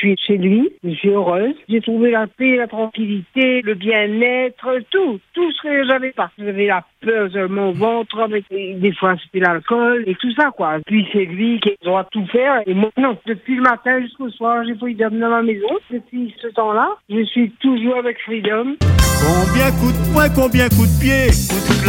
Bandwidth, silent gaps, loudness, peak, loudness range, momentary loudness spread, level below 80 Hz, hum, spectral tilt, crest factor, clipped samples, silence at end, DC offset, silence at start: 17 kHz; none; -17 LUFS; 0 dBFS; 4 LU; 8 LU; -30 dBFS; none; -5.5 dB/octave; 16 dB; under 0.1%; 0 s; under 0.1%; 0 s